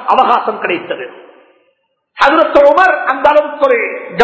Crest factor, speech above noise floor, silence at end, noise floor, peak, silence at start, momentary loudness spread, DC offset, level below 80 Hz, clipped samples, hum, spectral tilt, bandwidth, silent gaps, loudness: 12 dB; 50 dB; 0 s; -61 dBFS; 0 dBFS; 0 s; 11 LU; under 0.1%; -48 dBFS; 0.9%; none; -4.5 dB/octave; 8 kHz; none; -11 LUFS